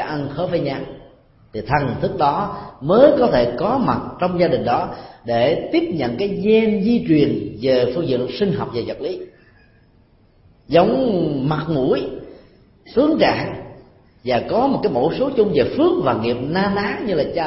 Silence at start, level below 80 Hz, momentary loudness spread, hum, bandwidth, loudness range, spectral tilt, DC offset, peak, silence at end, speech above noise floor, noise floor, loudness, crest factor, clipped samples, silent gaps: 0 s; -46 dBFS; 12 LU; none; 5.8 kHz; 4 LU; -10.5 dB/octave; under 0.1%; 0 dBFS; 0 s; 35 dB; -53 dBFS; -19 LUFS; 18 dB; under 0.1%; none